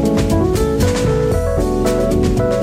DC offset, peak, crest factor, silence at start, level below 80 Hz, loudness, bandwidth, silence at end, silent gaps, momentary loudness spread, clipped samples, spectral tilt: under 0.1%; -4 dBFS; 10 dB; 0 s; -24 dBFS; -16 LUFS; 16 kHz; 0 s; none; 1 LU; under 0.1%; -6.5 dB/octave